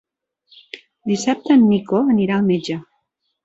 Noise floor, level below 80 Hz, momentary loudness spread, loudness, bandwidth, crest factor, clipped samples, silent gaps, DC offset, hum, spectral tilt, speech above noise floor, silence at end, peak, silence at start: -71 dBFS; -62 dBFS; 21 LU; -17 LUFS; 8 kHz; 16 dB; under 0.1%; none; under 0.1%; none; -6 dB/octave; 55 dB; 0.65 s; -4 dBFS; 0.75 s